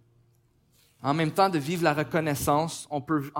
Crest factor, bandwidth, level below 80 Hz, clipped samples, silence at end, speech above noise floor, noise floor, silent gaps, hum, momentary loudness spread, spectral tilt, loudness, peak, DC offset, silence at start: 20 dB; 17 kHz; -60 dBFS; under 0.1%; 0 s; 39 dB; -65 dBFS; none; none; 7 LU; -5.5 dB/octave; -26 LUFS; -8 dBFS; under 0.1%; 1 s